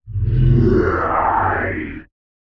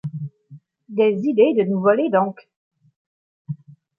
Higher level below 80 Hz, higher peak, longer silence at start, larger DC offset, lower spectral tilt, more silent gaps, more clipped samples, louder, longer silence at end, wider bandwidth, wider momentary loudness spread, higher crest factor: first, -26 dBFS vs -72 dBFS; about the same, -4 dBFS vs -2 dBFS; about the same, 0.05 s vs 0.05 s; neither; about the same, -10.5 dB/octave vs -9.5 dB/octave; second, none vs 2.56-2.71 s, 2.96-3.45 s; neither; about the same, -17 LUFS vs -19 LUFS; about the same, 0.5 s vs 0.45 s; first, 5.6 kHz vs 5 kHz; second, 13 LU vs 18 LU; second, 12 dB vs 18 dB